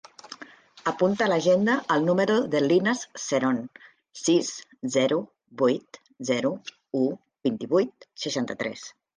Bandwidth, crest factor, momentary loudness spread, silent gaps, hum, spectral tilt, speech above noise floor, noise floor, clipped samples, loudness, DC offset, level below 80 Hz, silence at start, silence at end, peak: 10 kHz; 16 dB; 15 LU; none; none; -4.5 dB/octave; 24 dB; -48 dBFS; under 0.1%; -25 LUFS; under 0.1%; -72 dBFS; 0.3 s; 0.25 s; -10 dBFS